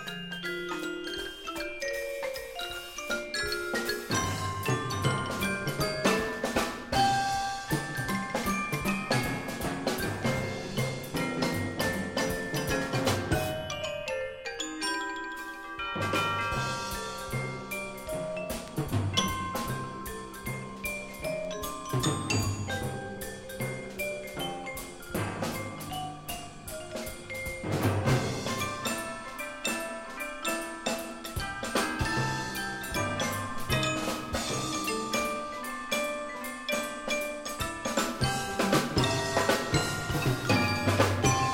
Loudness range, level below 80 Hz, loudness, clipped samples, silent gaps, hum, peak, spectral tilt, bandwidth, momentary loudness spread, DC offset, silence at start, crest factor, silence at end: 5 LU; -50 dBFS; -31 LUFS; under 0.1%; none; none; -10 dBFS; -4 dB/octave; 16.5 kHz; 10 LU; under 0.1%; 0 s; 22 dB; 0 s